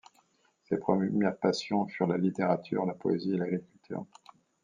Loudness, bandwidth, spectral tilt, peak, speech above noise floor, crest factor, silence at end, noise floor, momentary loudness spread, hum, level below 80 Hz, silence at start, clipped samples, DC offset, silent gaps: -31 LUFS; 9.4 kHz; -7 dB/octave; -10 dBFS; 40 dB; 20 dB; 0.6 s; -70 dBFS; 13 LU; none; -74 dBFS; 0.7 s; under 0.1%; under 0.1%; none